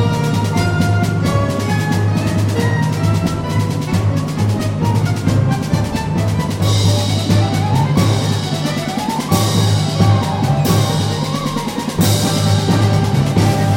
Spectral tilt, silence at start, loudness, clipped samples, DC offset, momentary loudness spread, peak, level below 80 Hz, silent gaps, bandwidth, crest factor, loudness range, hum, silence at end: -6 dB/octave; 0 s; -16 LUFS; under 0.1%; under 0.1%; 4 LU; -2 dBFS; -36 dBFS; none; 16.5 kHz; 14 dB; 1 LU; none; 0 s